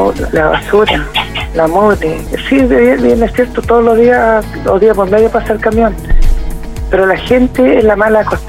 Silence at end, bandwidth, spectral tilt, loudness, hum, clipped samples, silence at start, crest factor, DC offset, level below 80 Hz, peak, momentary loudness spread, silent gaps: 0 s; 16 kHz; -6 dB/octave; -10 LUFS; none; under 0.1%; 0 s; 10 dB; under 0.1%; -18 dBFS; 0 dBFS; 9 LU; none